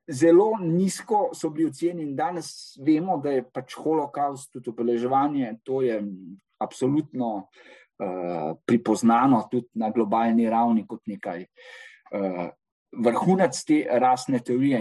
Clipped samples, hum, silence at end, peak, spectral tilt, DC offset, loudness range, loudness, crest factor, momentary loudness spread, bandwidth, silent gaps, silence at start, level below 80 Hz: under 0.1%; none; 0 s; -8 dBFS; -6.5 dB/octave; under 0.1%; 4 LU; -24 LUFS; 16 dB; 15 LU; 12.5 kHz; 12.72-12.86 s; 0.1 s; -72 dBFS